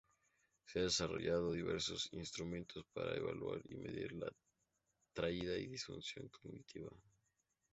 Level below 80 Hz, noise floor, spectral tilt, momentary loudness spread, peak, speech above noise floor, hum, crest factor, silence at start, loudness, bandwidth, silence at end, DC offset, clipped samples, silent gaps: -66 dBFS; -86 dBFS; -4 dB/octave; 15 LU; -22 dBFS; 42 dB; none; 22 dB; 0.65 s; -43 LUFS; 8 kHz; 0.75 s; under 0.1%; under 0.1%; none